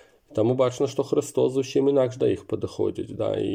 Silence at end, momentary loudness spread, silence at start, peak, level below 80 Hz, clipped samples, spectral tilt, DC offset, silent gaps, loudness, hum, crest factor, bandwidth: 0 s; 7 LU; 0.3 s; -10 dBFS; -62 dBFS; under 0.1%; -6.5 dB/octave; under 0.1%; none; -25 LUFS; none; 14 dB; 15.5 kHz